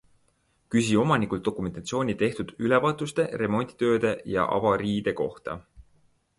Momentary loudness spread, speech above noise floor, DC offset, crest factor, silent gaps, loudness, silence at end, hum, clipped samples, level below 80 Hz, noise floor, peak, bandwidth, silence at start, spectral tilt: 8 LU; 43 dB; under 0.1%; 18 dB; none; -26 LUFS; 0.6 s; none; under 0.1%; -54 dBFS; -68 dBFS; -8 dBFS; 11.5 kHz; 0.7 s; -6 dB/octave